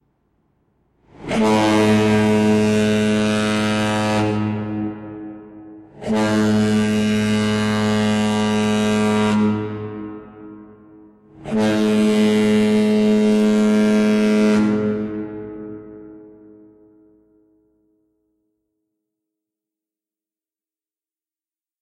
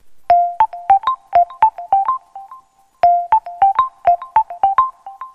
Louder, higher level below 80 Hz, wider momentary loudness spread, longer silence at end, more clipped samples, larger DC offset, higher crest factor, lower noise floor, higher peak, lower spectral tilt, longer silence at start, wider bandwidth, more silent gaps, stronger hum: about the same, -18 LUFS vs -16 LUFS; about the same, -52 dBFS vs -52 dBFS; first, 17 LU vs 5 LU; first, 5.55 s vs 0.1 s; neither; neither; about the same, 14 dB vs 14 dB; first, under -90 dBFS vs -45 dBFS; second, -6 dBFS vs -2 dBFS; about the same, -6 dB/octave vs -5 dB/octave; first, 1.2 s vs 0.05 s; first, 12.5 kHz vs 5.6 kHz; neither; neither